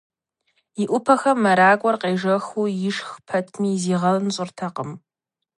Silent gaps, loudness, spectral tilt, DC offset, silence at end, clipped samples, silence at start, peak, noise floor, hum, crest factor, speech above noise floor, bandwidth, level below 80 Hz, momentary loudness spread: none; -21 LUFS; -5.5 dB/octave; under 0.1%; 0.6 s; under 0.1%; 0.75 s; -2 dBFS; -85 dBFS; none; 20 dB; 64 dB; 11.5 kHz; -70 dBFS; 14 LU